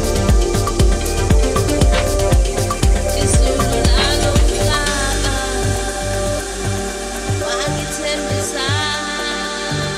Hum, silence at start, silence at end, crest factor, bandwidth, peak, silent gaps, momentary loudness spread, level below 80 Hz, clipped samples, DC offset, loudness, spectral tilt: none; 0 s; 0 s; 16 dB; 15 kHz; 0 dBFS; none; 6 LU; -20 dBFS; under 0.1%; under 0.1%; -17 LUFS; -4 dB/octave